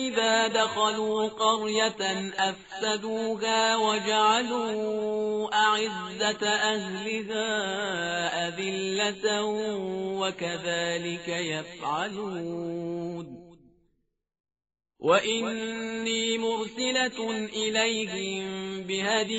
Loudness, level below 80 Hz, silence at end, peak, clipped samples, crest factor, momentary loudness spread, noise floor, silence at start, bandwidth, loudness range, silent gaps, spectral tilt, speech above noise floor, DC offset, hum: -27 LUFS; -68 dBFS; 0 s; -10 dBFS; under 0.1%; 18 dB; 9 LU; -74 dBFS; 0 s; 8 kHz; 6 LU; 14.40-14.44 s; -1.5 dB/octave; 46 dB; under 0.1%; none